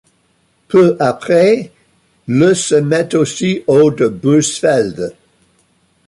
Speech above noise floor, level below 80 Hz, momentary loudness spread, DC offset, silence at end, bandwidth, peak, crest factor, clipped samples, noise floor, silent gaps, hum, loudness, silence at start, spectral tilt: 46 dB; -54 dBFS; 8 LU; under 0.1%; 0.95 s; 11.5 kHz; -2 dBFS; 12 dB; under 0.1%; -58 dBFS; none; none; -13 LUFS; 0.7 s; -5.5 dB/octave